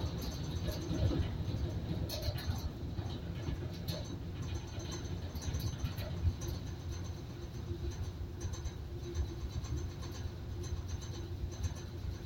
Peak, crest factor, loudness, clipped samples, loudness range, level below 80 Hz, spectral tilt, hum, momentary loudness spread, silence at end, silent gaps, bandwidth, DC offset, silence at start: -20 dBFS; 18 dB; -41 LUFS; under 0.1%; 4 LU; -44 dBFS; -6 dB/octave; none; 6 LU; 0 s; none; 16.5 kHz; under 0.1%; 0 s